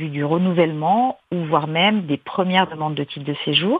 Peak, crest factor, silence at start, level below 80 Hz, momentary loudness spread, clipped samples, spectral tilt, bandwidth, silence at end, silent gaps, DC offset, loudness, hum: -2 dBFS; 18 dB; 0 s; -64 dBFS; 8 LU; under 0.1%; -8.5 dB/octave; 5 kHz; 0 s; none; under 0.1%; -20 LUFS; none